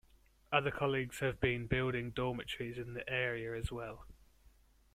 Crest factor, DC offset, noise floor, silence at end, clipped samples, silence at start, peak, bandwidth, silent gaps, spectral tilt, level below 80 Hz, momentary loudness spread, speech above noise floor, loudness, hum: 24 dB; under 0.1%; -67 dBFS; 0.8 s; under 0.1%; 0.5 s; -16 dBFS; 15 kHz; none; -6 dB/octave; -56 dBFS; 9 LU; 30 dB; -37 LUFS; none